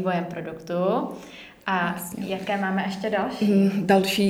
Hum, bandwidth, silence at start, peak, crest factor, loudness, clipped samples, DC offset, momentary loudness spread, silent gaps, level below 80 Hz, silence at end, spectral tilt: none; 16 kHz; 0 s; -8 dBFS; 18 dB; -25 LUFS; under 0.1%; under 0.1%; 14 LU; none; -62 dBFS; 0 s; -6 dB/octave